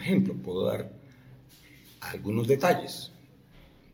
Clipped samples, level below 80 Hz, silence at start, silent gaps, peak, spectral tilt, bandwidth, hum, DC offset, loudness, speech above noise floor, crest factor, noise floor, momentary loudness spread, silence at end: under 0.1%; -62 dBFS; 0 s; none; -8 dBFS; -6.5 dB/octave; 18 kHz; none; under 0.1%; -29 LUFS; 27 dB; 22 dB; -55 dBFS; 17 LU; 0.85 s